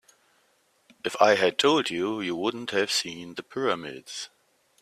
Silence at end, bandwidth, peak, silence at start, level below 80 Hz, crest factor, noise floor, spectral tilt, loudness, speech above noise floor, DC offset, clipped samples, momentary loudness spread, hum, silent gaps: 0.55 s; 15 kHz; -4 dBFS; 1.05 s; -72 dBFS; 22 dB; -67 dBFS; -3 dB/octave; -26 LUFS; 41 dB; under 0.1%; under 0.1%; 16 LU; none; none